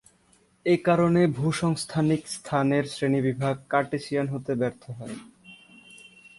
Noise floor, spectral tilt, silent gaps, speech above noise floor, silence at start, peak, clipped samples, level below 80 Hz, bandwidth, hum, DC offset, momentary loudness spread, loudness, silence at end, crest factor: -62 dBFS; -6.5 dB/octave; none; 38 dB; 0.65 s; -8 dBFS; under 0.1%; -60 dBFS; 11.5 kHz; none; under 0.1%; 12 LU; -25 LUFS; 0.1 s; 18 dB